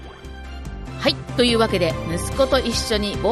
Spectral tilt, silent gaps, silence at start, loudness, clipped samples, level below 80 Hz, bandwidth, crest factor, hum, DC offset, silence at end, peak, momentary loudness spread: -4.5 dB/octave; none; 0 s; -20 LUFS; under 0.1%; -34 dBFS; 13 kHz; 18 dB; none; under 0.1%; 0 s; -4 dBFS; 17 LU